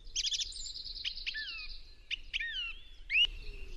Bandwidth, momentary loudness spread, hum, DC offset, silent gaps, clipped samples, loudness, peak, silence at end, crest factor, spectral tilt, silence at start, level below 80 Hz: 12.5 kHz; 18 LU; none; under 0.1%; none; under 0.1%; -34 LUFS; -20 dBFS; 0 s; 18 dB; 1.5 dB/octave; 0 s; -48 dBFS